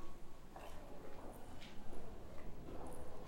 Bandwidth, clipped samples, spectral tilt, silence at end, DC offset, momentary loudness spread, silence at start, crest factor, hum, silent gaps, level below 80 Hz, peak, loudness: 15.5 kHz; under 0.1%; -5.5 dB/octave; 0 s; under 0.1%; 4 LU; 0 s; 12 dB; none; none; -54 dBFS; -30 dBFS; -55 LUFS